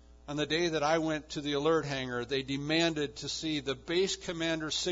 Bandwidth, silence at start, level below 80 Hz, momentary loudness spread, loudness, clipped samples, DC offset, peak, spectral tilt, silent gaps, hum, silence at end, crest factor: 7.8 kHz; 0.1 s; -56 dBFS; 6 LU; -32 LUFS; under 0.1%; under 0.1%; -16 dBFS; -4 dB/octave; none; none; 0 s; 16 dB